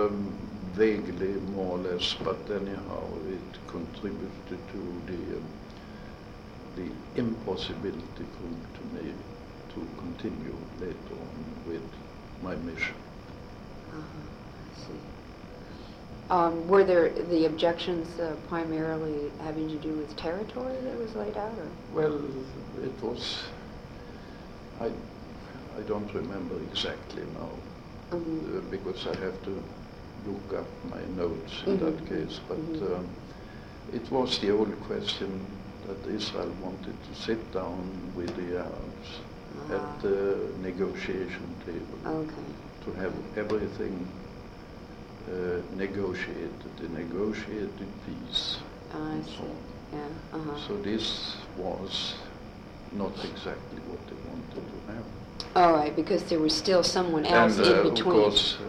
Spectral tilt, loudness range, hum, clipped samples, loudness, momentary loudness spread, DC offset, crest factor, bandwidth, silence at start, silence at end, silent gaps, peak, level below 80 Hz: -5 dB/octave; 12 LU; none; under 0.1%; -31 LUFS; 19 LU; under 0.1%; 22 dB; 13 kHz; 0 s; 0 s; none; -10 dBFS; -50 dBFS